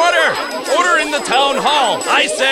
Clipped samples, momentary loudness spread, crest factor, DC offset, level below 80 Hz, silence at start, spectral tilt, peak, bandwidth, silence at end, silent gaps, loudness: under 0.1%; 3 LU; 14 dB; under 0.1%; -52 dBFS; 0 s; -1 dB/octave; 0 dBFS; 16.5 kHz; 0 s; none; -14 LUFS